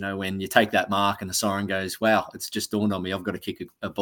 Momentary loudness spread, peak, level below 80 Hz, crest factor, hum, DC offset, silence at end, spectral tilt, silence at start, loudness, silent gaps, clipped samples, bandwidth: 11 LU; -2 dBFS; -62 dBFS; 24 dB; none; under 0.1%; 0 s; -4 dB/octave; 0 s; -25 LUFS; none; under 0.1%; 18 kHz